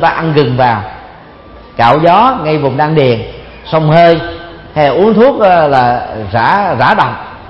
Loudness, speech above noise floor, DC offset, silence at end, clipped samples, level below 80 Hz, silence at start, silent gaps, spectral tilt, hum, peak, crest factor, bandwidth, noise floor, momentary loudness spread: -9 LUFS; 25 dB; under 0.1%; 0 s; 0.4%; -38 dBFS; 0 s; none; -8.5 dB/octave; none; 0 dBFS; 10 dB; 7.2 kHz; -34 dBFS; 12 LU